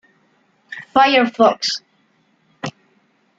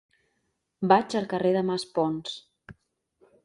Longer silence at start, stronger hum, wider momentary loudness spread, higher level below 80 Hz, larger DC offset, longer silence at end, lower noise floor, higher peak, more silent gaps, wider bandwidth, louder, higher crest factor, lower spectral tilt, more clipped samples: about the same, 0.7 s vs 0.8 s; neither; first, 19 LU vs 13 LU; about the same, -66 dBFS vs -68 dBFS; neither; about the same, 0.7 s vs 0.7 s; second, -60 dBFS vs -77 dBFS; about the same, -2 dBFS vs -4 dBFS; neither; second, 7.8 kHz vs 11.5 kHz; first, -16 LUFS vs -26 LUFS; second, 18 dB vs 24 dB; second, -3.5 dB/octave vs -6 dB/octave; neither